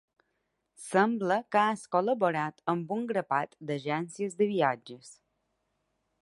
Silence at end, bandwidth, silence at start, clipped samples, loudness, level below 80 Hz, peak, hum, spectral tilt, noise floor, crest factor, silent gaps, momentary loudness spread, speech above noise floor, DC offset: 1.1 s; 11.5 kHz; 0.8 s; under 0.1%; -30 LUFS; -80 dBFS; -10 dBFS; none; -5.5 dB/octave; -80 dBFS; 20 dB; none; 9 LU; 50 dB; under 0.1%